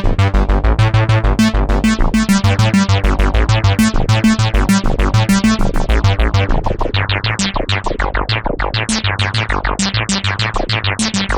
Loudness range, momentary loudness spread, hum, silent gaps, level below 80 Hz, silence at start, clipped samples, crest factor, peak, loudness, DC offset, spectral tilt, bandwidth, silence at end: 3 LU; 5 LU; none; none; -18 dBFS; 0 s; under 0.1%; 12 dB; -2 dBFS; -15 LUFS; under 0.1%; -5 dB/octave; 20 kHz; 0 s